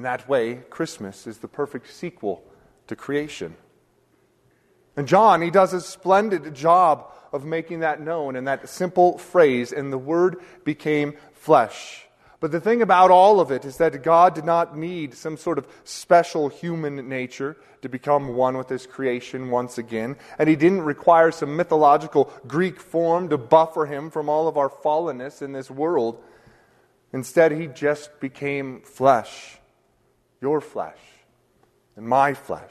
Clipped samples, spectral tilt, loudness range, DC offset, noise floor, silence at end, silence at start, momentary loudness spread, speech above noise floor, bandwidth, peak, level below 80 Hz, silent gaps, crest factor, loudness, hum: under 0.1%; -6 dB/octave; 8 LU; under 0.1%; -64 dBFS; 0.05 s; 0 s; 17 LU; 43 dB; 13.5 kHz; -2 dBFS; -64 dBFS; none; 20 dB; -21 LUFS; none